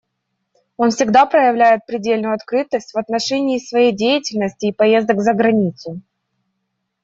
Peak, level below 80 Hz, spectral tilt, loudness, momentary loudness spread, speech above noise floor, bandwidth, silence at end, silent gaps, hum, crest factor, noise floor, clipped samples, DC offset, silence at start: -2 dBFS; -60 dBFS; -5 dB/octave; -16 LUFS; 9 LU; 58 dB; 7.8 kHz; 1.05 s; none; none; 14 dB; -73 dBFS; under 0.1%; under 0.1%; 0.8 s